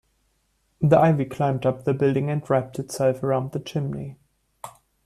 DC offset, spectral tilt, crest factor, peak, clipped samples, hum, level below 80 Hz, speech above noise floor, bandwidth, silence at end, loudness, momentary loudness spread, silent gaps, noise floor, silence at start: under 0.1%; -7.5 dB/octave; 18 dB; -6 dBFS; under 0.1%; none; -58 dBFS; 47 dB; 13.5 kHz; 0.35 s; -23 LUFS; 22 LU; none; -69 dBFS; 0.8 s